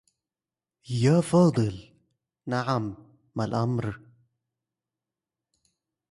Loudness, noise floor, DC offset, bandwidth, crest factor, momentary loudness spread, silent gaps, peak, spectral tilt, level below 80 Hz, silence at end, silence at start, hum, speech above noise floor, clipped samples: -26 LUFS; under -90 dBFS; under 0.1%; 11.5 kHz; 20 dB; 18 LU; none; -10 dBFS; -7 dB/octave; -58 dBFS; 2.15 s; 0.9 s; none; over 66 dB; under 0.1%